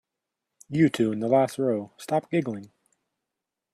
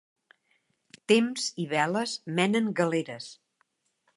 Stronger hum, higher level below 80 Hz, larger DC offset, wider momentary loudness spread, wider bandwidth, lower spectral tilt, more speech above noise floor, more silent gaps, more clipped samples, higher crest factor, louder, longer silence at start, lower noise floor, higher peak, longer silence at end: neither; first, -68 dBFS vs -80 dBFS; neither; second, 10 LU vs 16 LU; first, 13.5 kHz vs 11.5 kHz; first, -7 dB/octave vs -4.5 dB/octave; first, 61 dB vs 47 dB; neither; neither; about the same, 18 dB vs 22 dB; about the same, -25 LUFS vs -27 LUFS; second, 0.7 s vs 1.1 s; first, -86 dBFS vs -74 dBFS; about the same, -8 dBFS vs -8 dBFS; first, 1.05 s vs 0.85 s